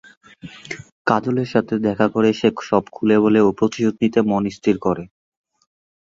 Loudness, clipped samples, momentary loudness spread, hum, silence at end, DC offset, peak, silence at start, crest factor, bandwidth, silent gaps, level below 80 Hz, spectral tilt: -19 LUFS; under 0.1%; 14 LU; none; 1.1 s; under 0.1%; -2 dBFS; 0.45 s; 18 dB; 7.6 kHz; 0.92-1.05 s; -54 dBFS; -7 dB/octave